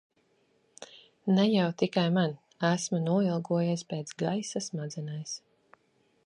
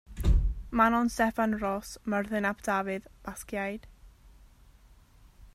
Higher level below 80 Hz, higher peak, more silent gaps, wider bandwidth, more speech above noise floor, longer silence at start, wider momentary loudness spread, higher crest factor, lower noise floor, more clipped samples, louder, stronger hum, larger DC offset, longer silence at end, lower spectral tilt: second, -76 dBFS vs -36 dBFS; about the same, -12 dBFS vs -10 dBFS; neither; second, 11 kHz vs 15 kHz; first, 41 dB vs 28 dB; first, 0.8 s vs 0.1 s; about the same, 14 LU vs 12 LU; about the same, 18 dB vs 22 dB; first, -70 dBFS vs -57 dBFS; neither; about the same, -30 LUFS vs -30 LUFS; neither; neither; first, 0.9 s vs 0.1 s; about the same, -5.5 dB/octave vs -6 dB/octave